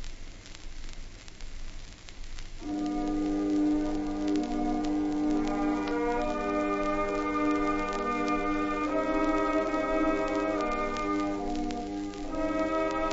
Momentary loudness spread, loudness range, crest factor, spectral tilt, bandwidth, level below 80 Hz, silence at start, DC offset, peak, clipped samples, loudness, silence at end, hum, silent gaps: 19 LU; 4 LU; 14 dB; -5.5 dB/octave; 8 kHz; -42 dBFS; 0 s; under 0.1%; -16 dBFS; under 0.1%; -30 LUFS; 0 s; none; none